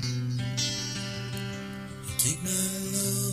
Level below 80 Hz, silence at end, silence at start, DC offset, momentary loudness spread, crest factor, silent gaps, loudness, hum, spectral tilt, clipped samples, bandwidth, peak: -54 dBFS; 0 s; 0 s; under 0.1%; 10 LU; 20 dB; none; -29 LUFS; none; -3.5 dB/octave; under 0.1%; 16 kHz; -10 dBFS